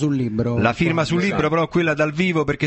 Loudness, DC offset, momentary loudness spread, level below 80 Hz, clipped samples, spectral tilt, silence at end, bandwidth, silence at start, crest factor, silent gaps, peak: -19 LUFS; under 0.1%; 2 LU; -44 dBFS; under 0.1%; -6.5 dB/octave; 0 s; 8.4 kHz; 0 s; 14 dB; none; -4 dBFS